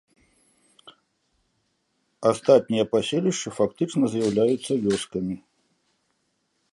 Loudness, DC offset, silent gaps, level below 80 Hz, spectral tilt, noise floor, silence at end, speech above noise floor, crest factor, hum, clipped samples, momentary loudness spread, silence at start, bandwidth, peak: -23 LUFS; under 0.1%; none; -62 dBFS; -5.5 dB/octave; -73 dBFS; 1.35 s; 50 dB; 22 dB; none; under 0.1%; 9 LU; 0.85 s; 11.5 kHz; -4 dBFS